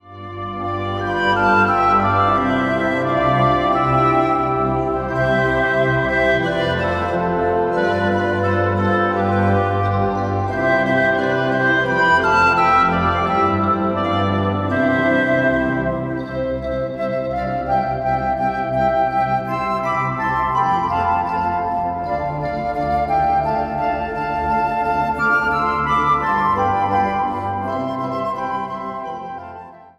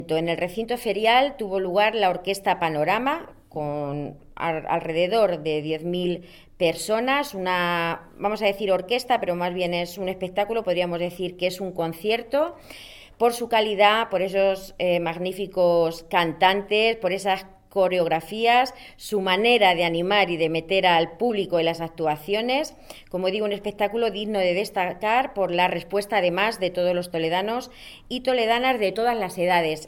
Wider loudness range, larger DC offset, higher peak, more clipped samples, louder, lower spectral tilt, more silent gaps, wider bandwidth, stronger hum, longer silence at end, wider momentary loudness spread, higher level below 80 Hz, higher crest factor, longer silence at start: about the same, 4 LU vs 4 LU; neither; about the same, -4 dBFS vs -4 dBFS; neither; first, -18 LUFS vs -23 LUFS; first, -7 dB/octave vs -4.5 dB/octave; neither; second, 12 kHz vs 18 kHz; neither; about the same, 0.1 s vs 0 s; about the same, 8 LU vs 9 LU; first, -40 dBFS vs -54 dBFS; second, 14 dB vs 20 dB; about the same, 0.05 s vs 0 s